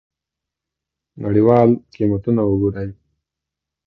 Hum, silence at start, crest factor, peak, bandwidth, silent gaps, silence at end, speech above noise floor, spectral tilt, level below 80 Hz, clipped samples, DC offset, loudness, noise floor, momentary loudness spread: none; 1.15 s; 18 dB; 0 dBFS; 5.8 kHz; none; 0.95 s; 68 dB; -11.5 dB/octave; -44 dBFS; under 0.1%; under 0.1%; -17 LUFS; -84 dBFS; 16 LU